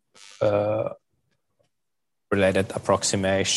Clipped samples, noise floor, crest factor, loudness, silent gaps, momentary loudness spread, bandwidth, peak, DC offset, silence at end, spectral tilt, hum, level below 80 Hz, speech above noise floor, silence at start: under 0.1%; -85 dBFS; 20 dB; -24 LUFS; none; 6 LU; 12.5 kHz; -6 dBFS; under 0.1%; 0 s; -4 dB/octave; none; -64 dBFS; 62 dB; 0.25 s